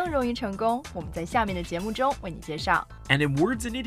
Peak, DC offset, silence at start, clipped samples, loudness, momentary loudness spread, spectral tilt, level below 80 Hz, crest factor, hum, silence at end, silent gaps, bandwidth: -6 dBFS; under 0.1%; 0 s; under 0.1%; -27 LUFS; 9 LU; -5.5 dB/octave; -44 dBFS; 20 dB; none; 0 s; none; 15.5 kHz